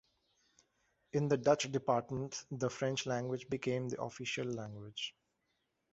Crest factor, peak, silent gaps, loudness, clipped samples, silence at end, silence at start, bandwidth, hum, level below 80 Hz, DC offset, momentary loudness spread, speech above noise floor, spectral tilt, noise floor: 24 dB; -14 dBFS; none; -37 LUFS; under 0.1%; 0.85 s; 1.15 s; 8 kHz; none; -72 dBFS; under 0.1%; 11 LU; 46 dB; -4.5 dB/octave; -82 dBFS